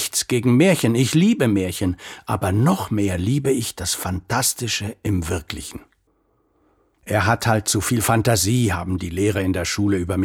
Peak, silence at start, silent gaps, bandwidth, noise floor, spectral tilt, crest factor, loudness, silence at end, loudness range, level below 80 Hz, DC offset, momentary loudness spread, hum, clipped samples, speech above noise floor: -2 dBFS; 0 s; none; 18 kHz; -64 dBFS; -5 dB/octave; 18 dB; -20 LUFS; 0 s; 6 LU; -44 dBFS; under 0.1%; 9 LU; none; under 0.1%; 45 dB